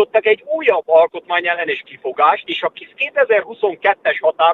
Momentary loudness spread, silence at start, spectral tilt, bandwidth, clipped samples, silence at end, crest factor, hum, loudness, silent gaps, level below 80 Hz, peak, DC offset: 8 LU; 0 s; -5 dB/octave; 4.3 kHz; under 0.1%; 0 s; 16 dB; none; -17 LUFS; none; -70 dBFS; 0 dBFS; under 0.1%